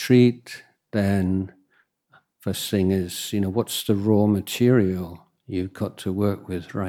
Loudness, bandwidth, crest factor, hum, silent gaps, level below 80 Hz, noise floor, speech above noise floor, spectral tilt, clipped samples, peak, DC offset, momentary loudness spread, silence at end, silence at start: -23 LUFS; 17.5 kHz; 18 dB; none; none; -58 dBFS; -65 dBFS; 44 dB; -6 dB/octave; under 0.1%; -6 dBFS; under 0.1%; 14 LU; 0 s; 0 s